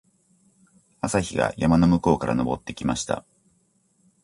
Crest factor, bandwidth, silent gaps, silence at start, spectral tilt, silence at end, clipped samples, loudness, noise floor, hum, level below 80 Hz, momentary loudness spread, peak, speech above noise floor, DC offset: 20 dB; 11.5 kHz; none; 1.05 s; -6 dB/octave; 1.05 s; under 0.1%; -23 LUFS; -66 dBFS; none; -44 dBFS; 10 LU; -4 dBFS; 44 dB; under 0.1%